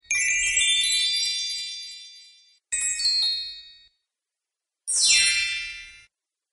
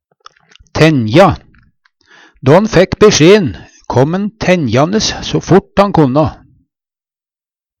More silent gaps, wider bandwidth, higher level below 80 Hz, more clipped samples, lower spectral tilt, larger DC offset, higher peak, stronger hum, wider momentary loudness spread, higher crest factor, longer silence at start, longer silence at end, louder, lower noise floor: neither; about the same, 11.5 kHz vs 12 kHz; second, -58 dBFS vs -36 dBFS; second, under 0.1% vs 0.1%; second, 4.5 dB/octave vs -5.5 dB/octave; neither; second, -6 dBFS vs 0 dBFS; neither; first, 19 LU vs 10 LU; first, 20 dB vs 12 dB; second, 0.1 s vs 0.75 s; second, 0.5 s vs 1.45 s; second, -21 LUFS vs -10 LUFS; about the same, -87 dBFS vs under -90 dBFS